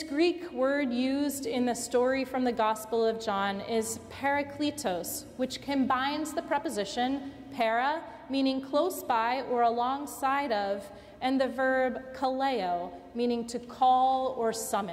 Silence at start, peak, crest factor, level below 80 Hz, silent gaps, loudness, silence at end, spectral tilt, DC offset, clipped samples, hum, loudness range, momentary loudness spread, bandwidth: 0 s; -16 dBFS; 14 dB; -62 dBFS; none; -30 LUFS; 0 s; -3.5 dB/octave; under 0.1%; under 0.1%; none; 2 LU; 7 LU; 16 kHz